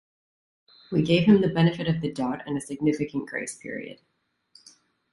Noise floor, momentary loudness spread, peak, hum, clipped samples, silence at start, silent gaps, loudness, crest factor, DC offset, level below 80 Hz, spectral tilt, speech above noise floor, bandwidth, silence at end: -60 dBFS; 16 LU; -6 dBFS; none; under 0.1%; 0.9 s; none; -25 LUFS; 20 dB; under 0.1%; -58 dBFS; -6.5 dB/octave; 36 dB; 11.5 kHz; 1.2 s